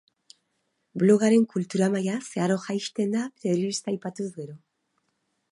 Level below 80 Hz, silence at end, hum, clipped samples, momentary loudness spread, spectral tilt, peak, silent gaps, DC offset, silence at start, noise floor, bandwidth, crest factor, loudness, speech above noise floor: -76 dBFS; 0.95 s; none; under 0.1%; 14 LU; -6 dB/octave; -8 dBFS; none; under 0.1%; 0.95 s; -75 dBFS; 11.5 kHz; 18 dB; -25 LUFS; 51 dB